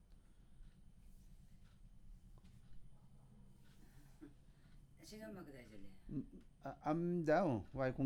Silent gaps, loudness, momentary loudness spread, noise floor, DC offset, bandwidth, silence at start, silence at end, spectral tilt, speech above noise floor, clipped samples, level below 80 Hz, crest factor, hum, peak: none; -42 LUFS; 30 LU; -64 dBFS; under 0.1%; 15 kHz; 0.1 s; 0 s; -8 dB/octave; 22 dB; under 0.1%; -62 dBFS; 20 dB; none; -24 dBFS